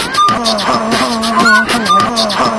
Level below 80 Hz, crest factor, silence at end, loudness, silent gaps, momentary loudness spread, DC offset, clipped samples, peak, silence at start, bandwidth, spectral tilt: -40 dBFS; 12 dB; 0 s; -11 LUFS; none; 4 LU; under 0.1%; under 0.1%; 0 dBFS; 0 s; 11 kHz; -3 dB/octave